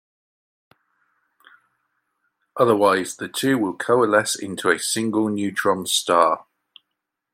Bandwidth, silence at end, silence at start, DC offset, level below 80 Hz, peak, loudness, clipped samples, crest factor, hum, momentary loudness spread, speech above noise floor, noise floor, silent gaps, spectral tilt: 16.5 kHz; 0.9 s; 2.55 s; under 0.1%; -72 dBFS; -2 dBFS; -20 LUFS; under 0.1%; 20 dB; none; 7 LU; 61 dB; -81 dBFS; none; -3.5 dB/octave